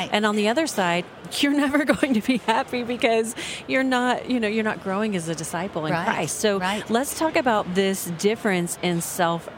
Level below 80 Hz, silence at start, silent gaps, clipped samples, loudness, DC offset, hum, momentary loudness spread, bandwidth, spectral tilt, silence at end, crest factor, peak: -58 dBFS; 0 s; none; under 0.1%; -23 LUFS; under 0.1%; none; 6 LU; 17 kHz; -4 dB/octave; 0 s; 18 dB; -4 dBFS